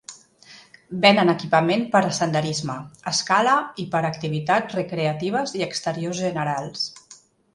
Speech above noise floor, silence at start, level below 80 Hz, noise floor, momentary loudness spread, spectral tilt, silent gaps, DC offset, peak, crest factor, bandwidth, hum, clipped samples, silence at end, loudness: 29 dB; 0.1 s; -64 dBFS; -51 dBFS; 10 LU; -4.5 dB/octave; none; under 0.1%; -2 dBFS; 22 dB; 11.5 kHz; none; under 0.1%; 0.4 s; -22 LUFS